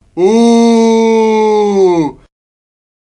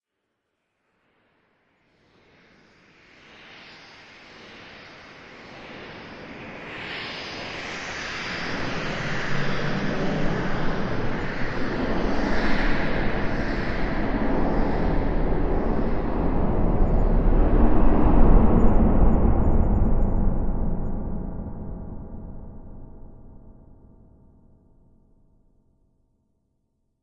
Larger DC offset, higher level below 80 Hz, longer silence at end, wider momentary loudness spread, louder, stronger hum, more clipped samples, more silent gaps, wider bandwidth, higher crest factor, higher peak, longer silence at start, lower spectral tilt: neither; second, -50 dBFS vs -26 dBFS; second, 0.9 s vs 3.7 s; second, 4 LU vs 22 LU; first, -9 LUFS vs -25 LUFS; neither; neither; neither; first, 10.5 kHz vs 7 kHz; second, 10 dB vs 20 dB; about the same, 0 dBFS vs -2 dBFS; second, 0.15 s vs 4.4 s; second, -5.5 dB/octave vs -7 dB/octave